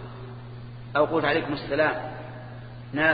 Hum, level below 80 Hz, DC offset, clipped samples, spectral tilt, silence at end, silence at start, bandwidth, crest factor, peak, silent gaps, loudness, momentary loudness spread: none; -52 dBFS; under 0.1%; under 0.1%; -8.5 dB/octave; 0 s; 0 s; 5 kHz; 20 dB; -8 dBFS; none; -26 LUFS; 18 LU